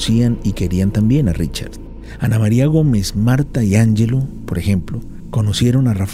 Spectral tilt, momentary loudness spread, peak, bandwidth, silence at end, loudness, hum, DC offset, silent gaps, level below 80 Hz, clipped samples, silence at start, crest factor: -6.5 dB/octave; 11 LU; -2 dBFS; 15 kHz; 0 s; -16 LUFS; none; under 0.1%; none; -30 dBFS; under 0.1%; 0 s; 14 dB